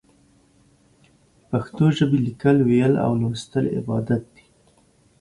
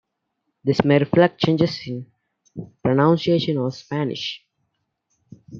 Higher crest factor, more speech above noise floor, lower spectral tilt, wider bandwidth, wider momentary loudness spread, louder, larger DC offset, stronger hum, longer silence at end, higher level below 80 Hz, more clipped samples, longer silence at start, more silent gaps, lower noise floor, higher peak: about the same, 16 dB vs 20 dB; second, 39 dB vs 56 dB; about the same, -8 dB/octave vs -7.5 dB/octave; first, 11.5 kHz vs 7.2 kHz; second, 9 LU vs 17 LU; about the same, -21 LUFS vs -20 LUFS; neither; neither; first, 0.95 s vs 0 s; about the same, -54 dBFS vs -58 dBFS; neither; first, 1.5 s vs 0.65 s; neither; second, -58 dBFS vs -76 dBFS; second, -6 dBFS vs -2 dBFS